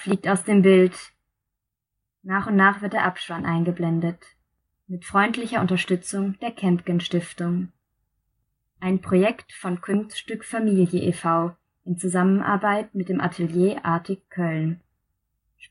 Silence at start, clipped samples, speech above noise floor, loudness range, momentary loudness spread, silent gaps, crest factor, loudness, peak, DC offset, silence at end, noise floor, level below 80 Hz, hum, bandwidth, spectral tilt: 0 s; under 0.1%; 61 dB; 4 LU; 13 LU; none; 20 dB; -23 LUFS; -4 dBFS; under 0.1%; 0.95 s; -83 dBFS; -64 dBFS; none; 11.5 kHz; -6.5 dB/octave